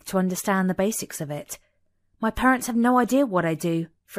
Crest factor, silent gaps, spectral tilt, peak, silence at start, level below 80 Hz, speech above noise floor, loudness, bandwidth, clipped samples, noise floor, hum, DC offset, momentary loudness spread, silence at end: 18 dB; none; -5.5 dB/octave; -6 dBFS; 0.05 s; -50 dBFS; 45 dB; -23 LUFS; 15.5 kHz; under 0.1%; -68 dBFS; none; under 0.1%; 12 LU; 0 s